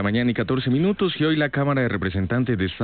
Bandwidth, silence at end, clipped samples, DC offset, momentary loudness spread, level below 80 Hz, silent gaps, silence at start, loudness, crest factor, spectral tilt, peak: 4.6 kHz; 0 s; under 0.1%; 0.2%; 3 LU; -42 dBFS; none; 0 s; -22 LUFS; 12 dB; -11.5 dB/octave; -10 dBFS